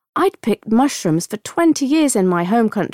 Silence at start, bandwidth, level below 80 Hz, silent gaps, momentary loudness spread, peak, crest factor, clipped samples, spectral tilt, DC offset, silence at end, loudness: 0.15 s; 16 kHz; -58 dBFS; none; 6 LU; -6 dBFS; 10 dB; under 0.1%; -5 dB/octave; under 0.1%; 0.05 s; -17 LUFS